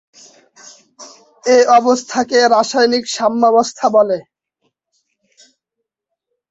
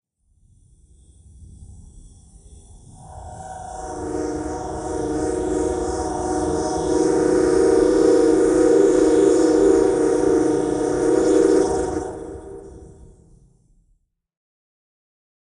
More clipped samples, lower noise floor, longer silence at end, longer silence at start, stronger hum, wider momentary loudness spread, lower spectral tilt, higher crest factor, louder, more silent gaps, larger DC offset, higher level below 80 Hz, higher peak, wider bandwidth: neither; first, -78 dBFS vs -65 dBFS; second, 2.3 s vs 2.55 s; second, 1 s vs 1.4 s; neither; second, 7 LU vs 19 LU; second, -2.5 dB/octave vs -5.5 dB/octave; about the same, 16 dB vs 16 dB; first, -13 LUFS vs -19 LUFS; neither; neither; second, -64 dBFS vs -42 dBFS; about the same, -2 dBFS vs -4 dBFS; second, 8.2 kHz vs 10.5 kHz